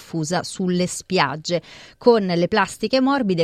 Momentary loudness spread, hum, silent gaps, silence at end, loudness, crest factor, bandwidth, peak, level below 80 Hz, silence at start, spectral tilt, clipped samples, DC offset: 7 LU; none; none; 0 s; -20 LUFS; 18 dB; 14 kHz; -2 dBFS; -56 dBFS; 0 s; -5 dB/octave; under 0.1%; under 0.1%